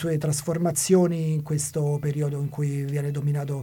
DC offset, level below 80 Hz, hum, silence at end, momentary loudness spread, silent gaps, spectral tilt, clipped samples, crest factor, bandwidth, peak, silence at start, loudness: under 0.1%; -60 dBFS; none; 0 s; 7 LU; none; -6 dB/octave; under 0.1%; 16 dB; 17 kHz; -8 dBFS; 0 s; -25 LUFS